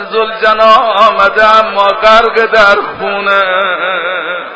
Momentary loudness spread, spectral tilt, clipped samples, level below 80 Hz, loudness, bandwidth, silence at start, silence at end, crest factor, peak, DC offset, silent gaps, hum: 8 LU; -3 dB/octave; 2%; -42 dBFS; -8 LUFS; 8 kHz; 0 s; 0 s; 8 dB; 0 dBFS; under 0.1%; none; none